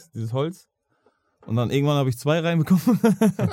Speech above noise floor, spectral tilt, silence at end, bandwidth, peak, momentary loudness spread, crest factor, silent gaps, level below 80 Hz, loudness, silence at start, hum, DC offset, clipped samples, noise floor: 45 dB; -7 dB/octave; 0 s; 17 kHz; -4 dBFS; 9 LU; 18 dB; none; -60 dBFS; -22 LUFS; 0.15 s; none; under 0.1%; under 0.1%; -66 dBFS